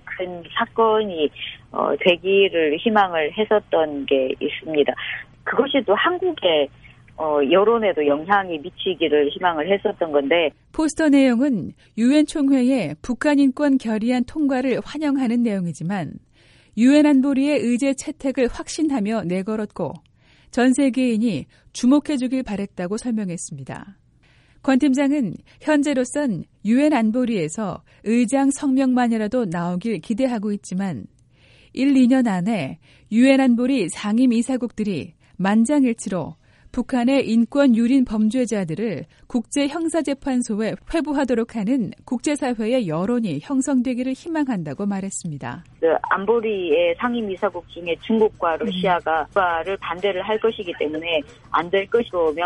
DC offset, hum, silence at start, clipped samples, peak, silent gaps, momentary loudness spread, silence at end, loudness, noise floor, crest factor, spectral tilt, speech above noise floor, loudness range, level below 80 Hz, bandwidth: under 0.1%; none; 0.05 s; under 0.1%; -2 dBFS; none; 11 LU; 0 s; -21 LUFS; -55 dBFS; 18 dB; -5.5 dB/octave; 35 dB; 4 LU; -52 dBFS; 11.5 kHz